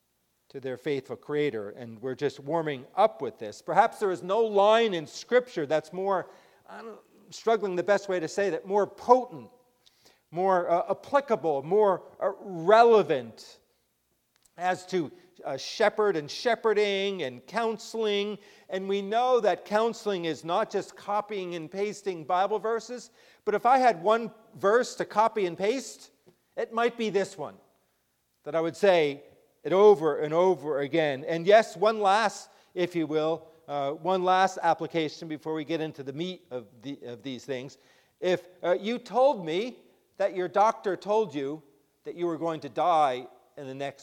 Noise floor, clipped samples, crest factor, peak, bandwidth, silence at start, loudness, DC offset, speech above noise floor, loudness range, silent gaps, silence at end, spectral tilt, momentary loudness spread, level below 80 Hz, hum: -74 dBFS; under 0.1%; 22 dB; -4 dBFS; 14 kHz; 0.55 s; -27 LUFS; under 0.1%; 47 dB; 6 LU; none; 0.1 s; -5 dB/octave; 17 LU; -78 dBFS; none